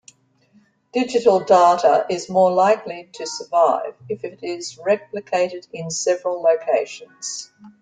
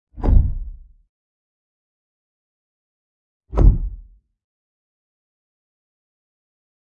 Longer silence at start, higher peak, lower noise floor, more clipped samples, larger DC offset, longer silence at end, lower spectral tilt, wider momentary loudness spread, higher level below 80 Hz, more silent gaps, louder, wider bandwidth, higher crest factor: first, 0.95 s vs 0.15 s; about the same, -2 dBFS vs 0 dBFS; first, -58 dBFS vs -43 dBFS; neither; neither; second, 0.15 s vs 2.8 s; second, -4 dB/octave vs -11 dB/octave; about the same, 15 LU vs 17 LU; second, -68 dBFS vs -24 dBFS; second, none vs 1.09-3.40 s; about the same, -19 LUFS vs -20 LUFS; first, 9.4 kHz vs 2.6 kHz; about the same, 18 dB vs 22 dB